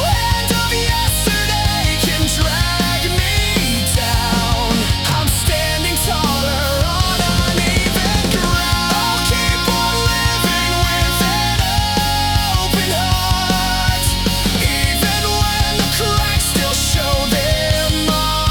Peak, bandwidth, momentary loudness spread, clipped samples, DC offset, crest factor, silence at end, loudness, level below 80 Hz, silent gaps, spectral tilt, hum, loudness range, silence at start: -4 dBFS; over 20 kHz; 1 LU; under 0.1%; under 0.1%; 12 dB; 0 s; -15 LUFS; -24 dBFS; none; -3.5 dB/octave; none; 1 LU; 0 s